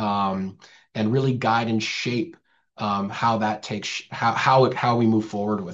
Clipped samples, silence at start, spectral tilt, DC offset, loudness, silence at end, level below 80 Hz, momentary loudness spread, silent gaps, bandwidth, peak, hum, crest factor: under 0.1%; 0 s; -6 dB/octave; under 0.1%; -23 LUFS; 0 s; -66 dBFS; 11 LU; none; 8 kHz; -4 dBFS; none; 18 dB